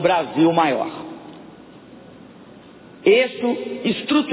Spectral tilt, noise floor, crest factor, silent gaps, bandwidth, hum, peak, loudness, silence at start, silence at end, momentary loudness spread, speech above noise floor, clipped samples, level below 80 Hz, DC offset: -9.5 dB/octave; -44 dBFS; 18 dB; none; 4 kHz; none; -4 dBFS; -19 LUFS; 0 s; 0 s; 21 LU; 25 dB; under 0.1%; -62 dBFS; under 0.1%